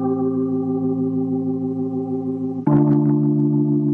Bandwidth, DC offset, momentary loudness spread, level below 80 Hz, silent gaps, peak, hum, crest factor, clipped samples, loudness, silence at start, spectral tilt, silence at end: 2.3 kHz; under 0.1%; 8 LU; -58 dBFS; none; -4 dBFS; none; 14 dB; under 0.1%; -20 LUFS; 0 s; -13.5 dB/octave; 0 s